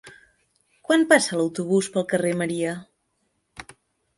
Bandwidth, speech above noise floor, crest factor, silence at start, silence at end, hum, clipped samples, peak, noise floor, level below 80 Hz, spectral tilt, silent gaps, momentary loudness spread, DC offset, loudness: 11.5 kHz; 51 dB; 22 dB; 0.05 s; 0.55 s; none; under 0.1%; -2 dBFS; -72 dBFS; -66 dBFS; -4.5 dB/octave; none; 24 LU; under 0.1%; -22 LUFS